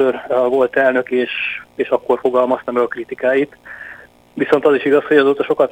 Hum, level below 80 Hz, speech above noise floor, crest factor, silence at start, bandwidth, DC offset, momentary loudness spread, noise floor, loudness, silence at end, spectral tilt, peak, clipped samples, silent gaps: none; -58 dBFS; 23 dB; 16 dB; 0 s; 16.5 kHz; under 0.1%; 11 LU; -39 dBFS; -16 LUFS; 0 s; -6 dB/octave; 0 dBFS; under 0.1%; none